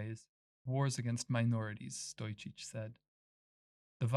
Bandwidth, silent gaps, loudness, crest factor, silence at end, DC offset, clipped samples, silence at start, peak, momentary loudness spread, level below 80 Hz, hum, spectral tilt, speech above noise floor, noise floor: 12 kHz; 0.29-0.65 s, 3.08-4.00 s; -39 LUFS; 20 dB; 0 s; under 0.1%; under 0.1%; 0 s; -20 dBFS; 13 LU; -78 dBFS; none; -5.5 dB/octave; over 52 dB; under -90 dBFS